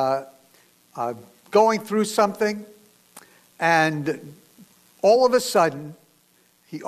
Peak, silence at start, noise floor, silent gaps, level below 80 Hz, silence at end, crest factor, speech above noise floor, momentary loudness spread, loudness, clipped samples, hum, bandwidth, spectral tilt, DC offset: -6 dBFS; 0 s; -61 dBFS; none; -72 dBFS; 0 s; 18 dB; 40 dB; 19 LU; -21 LUFS; under 0.1%; none; 14.5 kHz; -4.5 dB/octave; under 0.1%